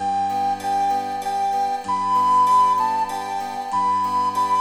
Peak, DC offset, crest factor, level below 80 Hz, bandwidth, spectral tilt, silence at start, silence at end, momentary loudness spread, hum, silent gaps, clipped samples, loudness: -8 dBFS; under 0.1%; 12 dB; -66 dBFS; 14.5 kHz; -3.5 dB/octave; 0 s; 0 s; 9 LU; none; none; under 0.1%; -20 LUFS